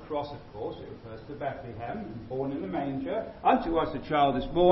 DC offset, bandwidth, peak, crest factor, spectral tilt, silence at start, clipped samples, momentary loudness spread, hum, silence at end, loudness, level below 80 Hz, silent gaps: under 0.1%; 6 kHz; -8 dBFS; 20 dB; -9.5 dB/octave; 0 s; under 0.1%; 14 LU; none; 0 s; -30 LUFS; -50 dBFS; none